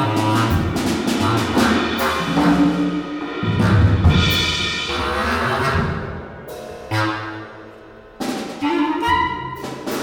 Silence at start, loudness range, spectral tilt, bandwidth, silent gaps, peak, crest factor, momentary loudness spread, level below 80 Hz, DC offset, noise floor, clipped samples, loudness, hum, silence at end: 0 s; 7 LU; -5.5 dB/octave; over 20 kHz; none; -4 dBFS; 14 dB; 15 LU; -34 dBFS; under 0.1%; -41 dBFS; under 0.1%; -19 LUFS; none; 0 s